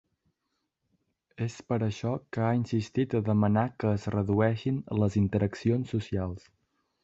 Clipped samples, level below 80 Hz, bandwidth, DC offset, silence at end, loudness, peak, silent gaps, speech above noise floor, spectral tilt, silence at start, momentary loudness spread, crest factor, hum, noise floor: under 0.1%; -52 dBFS; 7.8 kHz; under 0.1%; 0.65 s; -29 LUFS; -12 dBFS; none; 53 dB; -8 dB/octave; 1.4 s; 8 LU; 18 dB; none; -81 dBFS